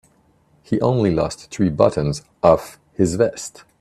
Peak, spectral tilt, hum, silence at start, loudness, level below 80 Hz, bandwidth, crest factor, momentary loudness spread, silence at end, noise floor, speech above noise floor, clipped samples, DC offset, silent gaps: 0 dBFS; -6.5 dB/octave; none; 0.7 s; -19 LUFS; -46 dBFS; 14 kHz; 20 dB; 9 LU; 0.3 s; -58 dBFS; 39 dB; under 0.1%; under 0.1%; none